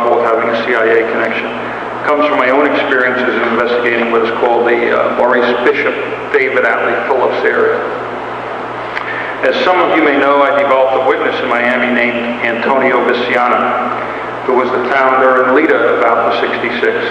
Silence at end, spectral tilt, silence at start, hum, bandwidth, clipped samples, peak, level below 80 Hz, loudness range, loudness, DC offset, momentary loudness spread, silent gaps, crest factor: 0 s; -5.5 dB/octave; 0 s; 60 Hz at -40 dBFS; 9.6 kHz; under 0.1%; 0 dBFS; -52 dBFS; 2 LU; -12 LUFS; under 0.1%; 9 LU; none; 12 dB